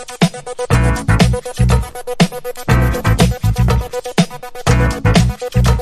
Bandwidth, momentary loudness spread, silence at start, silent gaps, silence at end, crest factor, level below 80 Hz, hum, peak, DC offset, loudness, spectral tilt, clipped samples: 14 kHz; 6 LU; 0 s; none; 0 s; 14 dB; -20 dBFS; none; 0 dBFS; under 0.1%; -15 LUFS; -6 dB/octave; under 0.1%